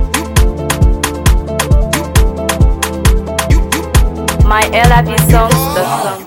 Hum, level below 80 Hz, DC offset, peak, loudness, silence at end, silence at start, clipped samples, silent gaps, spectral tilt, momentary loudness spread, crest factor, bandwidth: none; -14 dBFS; under 0.1%; 0 dBFS; -12 LUFS; 0 s; 0 s; under 0.1%; none; -5 dB/octave; 5 LU; 10 dB; 18 kHz